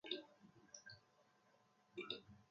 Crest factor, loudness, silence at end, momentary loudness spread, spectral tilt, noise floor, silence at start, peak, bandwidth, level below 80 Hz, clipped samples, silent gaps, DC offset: 26 dB; -53 LUFS; 0.05 s; 16 LU; -1.5 dB/octave; -76 dBFS; 0.05 s; -30 dBFS; 7.4 kHz; -86 dBFS; under 0.1%; none; under 0.1%